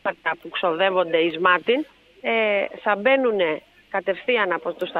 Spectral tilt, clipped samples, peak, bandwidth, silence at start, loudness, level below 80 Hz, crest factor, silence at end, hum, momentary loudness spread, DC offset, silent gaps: -6 dB/octave; under 0.1%; -4 dBFS; 5 kHz; 0.05 s; -22 LUFS; -68 dBFS; 18 dB; 0 s; none; 9 LU; under 0.1%; none